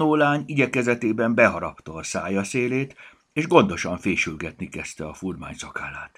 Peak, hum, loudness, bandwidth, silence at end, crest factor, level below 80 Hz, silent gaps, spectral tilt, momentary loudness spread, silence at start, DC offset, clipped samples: 0 dBFS; none; -23 LUFS; 13.5 kHz; 0.1 s; 24 dB; -52 dBFS; none; -5.5 dB/octave; 15 LU; 0 s; under 0.1%; under 0.1%